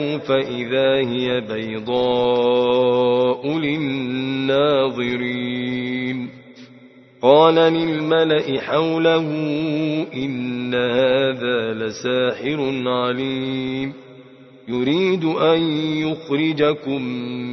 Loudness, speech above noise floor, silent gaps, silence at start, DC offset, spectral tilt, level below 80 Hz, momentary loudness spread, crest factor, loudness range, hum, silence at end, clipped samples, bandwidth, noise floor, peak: -19 LUFS; 27 dB; none; 0 s; under 0.1%; -6.5 dB/octave; -58 dBFS; 8 LU; 18 dB; 5 LU; none; 0 s; under 0.1%; 6.2 kHz; -46 dBFS; 0 dBFS